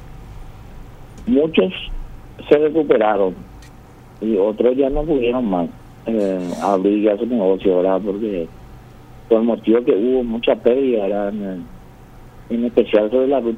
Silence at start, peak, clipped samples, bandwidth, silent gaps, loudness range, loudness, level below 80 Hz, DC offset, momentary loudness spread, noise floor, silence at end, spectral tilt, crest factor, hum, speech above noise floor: 0 s; 0 dBFS; under 0.1%; 9.6 kHz; none; 1 LU; -18 LUFS; -38 dBFS; under 0.1%; 14 LU; -41 dBFS; 0 s; -7.5 dB/octave; 18 dB; none; 24 dB